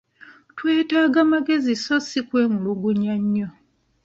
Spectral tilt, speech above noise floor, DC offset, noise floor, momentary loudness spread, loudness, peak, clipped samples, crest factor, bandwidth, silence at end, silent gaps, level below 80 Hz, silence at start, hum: -5.5 dB/octave; 29 dB; under 0.1%; -49 dBFS; 8 LU; -21 LUFS; -6 dBFS; under 0.1%; 16 dB; 7.8 kHz; 0.55 s; none; -64 dBFS; 0.3 s; none